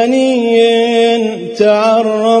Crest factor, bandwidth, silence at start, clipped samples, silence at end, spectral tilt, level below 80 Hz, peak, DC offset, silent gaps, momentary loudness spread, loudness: 10 dB; 10.5 kHz; 0 s; under 0.1%; 0 s; -4.5 dB/octave; -62 dBFS; 0 dBFS; under 0.1%; none; 4 LU; -11 LUFS